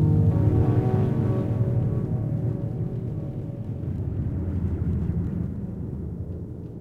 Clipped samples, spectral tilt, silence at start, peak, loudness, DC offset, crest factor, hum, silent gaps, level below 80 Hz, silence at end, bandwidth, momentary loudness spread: under 0.1%; -11.5 dB/octave; 0 s; -10 dBFS; -26 LUFS; under 0.1%; 14 dB; none; none; -38 dBFS; 0 s; 3.7 kHz; 12 LU